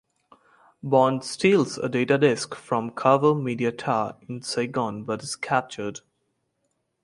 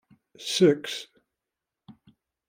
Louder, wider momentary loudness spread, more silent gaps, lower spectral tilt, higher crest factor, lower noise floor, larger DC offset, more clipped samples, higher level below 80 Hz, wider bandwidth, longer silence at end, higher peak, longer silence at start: about the same, -24 LUFS vs -24 LUFS; second, 12 LU vs 17 LU; neither; about the same, -5.5 dB/octave vs -4.5 dB/octave; about the same, 22 dB vs 20 dB; second, -75 dBFS vs -87 dBFS; neither; neither; first, -66 dBFS vs -72 dBFS; second, 11.5 kHz vs 16 kHz; first, 1.05 s vs 0.6 s; first, -4 dBFS vs -8 dBFS; first, 0.85 s vs 0.4 s